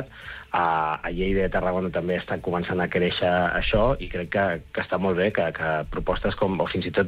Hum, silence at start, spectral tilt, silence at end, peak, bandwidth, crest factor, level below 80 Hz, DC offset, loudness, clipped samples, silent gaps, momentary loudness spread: none; 0 s; -8 dB/octave; 0 s; -10 dBFS; 5.4 kHz; 14 dB; -38 dBFS; under 0.1%; -25 LUFS; under 0.1%; none; 6 LU